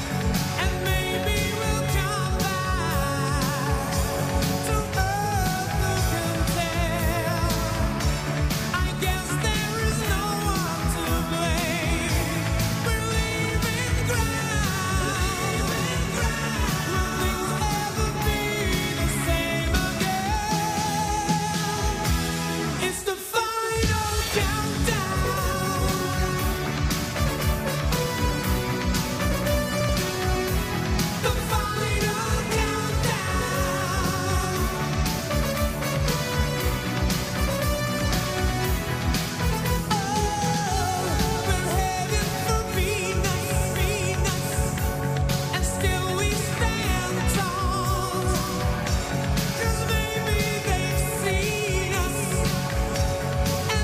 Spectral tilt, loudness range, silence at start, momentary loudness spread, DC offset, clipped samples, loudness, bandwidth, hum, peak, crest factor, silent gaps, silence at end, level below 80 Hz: -4.5 dB/octave; 1 LU; 0 s; 2 LU; under 0.1%; under 0.1%; -25 LUFS; 15.5 kHz; none; -10 dBFS; 14 dB; none; 0 s; -32 dBFS